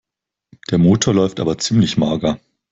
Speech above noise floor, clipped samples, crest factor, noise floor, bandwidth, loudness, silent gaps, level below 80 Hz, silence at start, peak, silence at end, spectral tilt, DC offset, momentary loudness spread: 49 dB; under 0.1%; 14 dB; -65 dBFS; 8.2 kHz; -16 LUFS; none; -48 dBFS; 0.7 s; -2 dBFS; 0.35 s; -5.5 dB/octave; under 0.1%; 9 LU